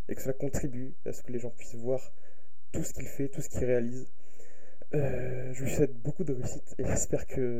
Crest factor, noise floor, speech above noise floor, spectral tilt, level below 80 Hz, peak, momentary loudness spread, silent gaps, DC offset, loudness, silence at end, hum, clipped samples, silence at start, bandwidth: 20 dB; -59 dBFS; 26 dB; -6.5 dB/octave; -48 dBFS; -12 dBFS; 10 LU; none; 5%; -34 LUFS; 0 s; none; under 0.1%; 0.1 s; 16 kHz